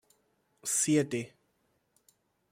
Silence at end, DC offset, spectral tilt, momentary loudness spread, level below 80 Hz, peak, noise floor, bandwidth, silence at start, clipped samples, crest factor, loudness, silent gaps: 1.25 s; under 0.1%; -4 dB/octave; 15 LU; -76 dBFS; -14 dBFS; -75 dBFS; 16 kHz; 0.65 s; under 0.1%; 20 dB; -30 LUFS; none